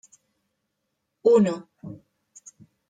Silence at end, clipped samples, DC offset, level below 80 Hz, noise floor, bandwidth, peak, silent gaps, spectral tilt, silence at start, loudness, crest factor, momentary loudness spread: 0.95 s; under 0.1%; under 0.1%; -72 dBFS; -79 dBFS; 9.2 kHz; -6 dBFS; none; -7 dB/octave; 1.25 s; -21 LUFS; 20 dB; 24 LU